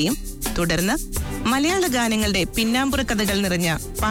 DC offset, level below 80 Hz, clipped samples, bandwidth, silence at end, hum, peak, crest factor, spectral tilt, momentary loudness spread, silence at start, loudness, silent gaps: under 0.1%; -34 dBFS; under 0.1%; 19.5 kHz; 0 s; none; -10 dBFS; 10 dB; -4 dB/octave; 5 LU; 0 s; -21 LUFS; none